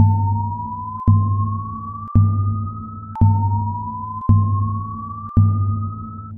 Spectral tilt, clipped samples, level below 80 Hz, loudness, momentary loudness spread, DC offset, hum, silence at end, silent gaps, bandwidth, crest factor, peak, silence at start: -13.5 dB/octave; under 0.1%; -36 dBFS; -20 LUFS; 12 LU; under 0.1%; none; 0 s; none; 1.4 kHz; 16 dB; -2 dBFS; 0 s